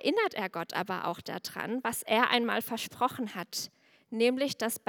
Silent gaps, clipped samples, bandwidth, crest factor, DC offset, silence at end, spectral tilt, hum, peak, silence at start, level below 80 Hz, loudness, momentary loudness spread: none; under 0.1%; over 20 kHz; 24 dB; under 0.1%; 0.1 s; -3 dB/octave; none; -8 dBFS; 0 s; -78 dBFS; -31 LUFS; 11 LU